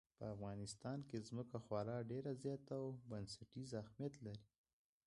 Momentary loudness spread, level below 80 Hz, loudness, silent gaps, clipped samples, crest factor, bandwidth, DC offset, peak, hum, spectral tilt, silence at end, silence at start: 7 LU; -74 dBFS; -50 LUFS; none; under 0.1%; 20 dB; 11 kHz; under 0.1%; -30 dBFS; none; -6.5 dB/octave; 0.6 s; 0.2 s